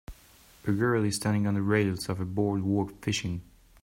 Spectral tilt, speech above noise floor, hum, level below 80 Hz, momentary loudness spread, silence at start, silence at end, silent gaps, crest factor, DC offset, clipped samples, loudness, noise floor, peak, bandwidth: -6 dB/octave; 29 dB; none; -54 dBFS; 7 LU; 0.1 s; 0.4 s; none; 16 dB; under 0.1%; under 0.1%; -29 LUFS; -57 dBFS; -12 dBFS; 16 kHz